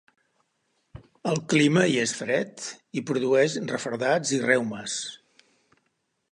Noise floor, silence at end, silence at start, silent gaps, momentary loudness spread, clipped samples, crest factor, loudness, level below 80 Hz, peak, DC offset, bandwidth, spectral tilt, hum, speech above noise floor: -75 dBFS; 1.15 s; 0.95 s; none; 13 LU; under 0.1%; 20 dB; -25 LUFS; -66 dBFS; -6 dBFS; under 0.1%; 11.5 kHz; -4.5 dB/octave; none; 50 dB